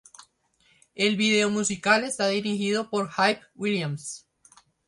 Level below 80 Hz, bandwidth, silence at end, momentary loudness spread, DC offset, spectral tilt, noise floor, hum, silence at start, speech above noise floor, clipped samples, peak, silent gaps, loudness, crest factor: -68 dBFS; 11.5 kHz; 0.7 s; 10 LU; under 0.1%; -3.5 dB/octave; -65 dBFS; none; 0.95 s; 40 dB; under 0.1%; -6 dBFS; none; -25 LUFS; 22 dB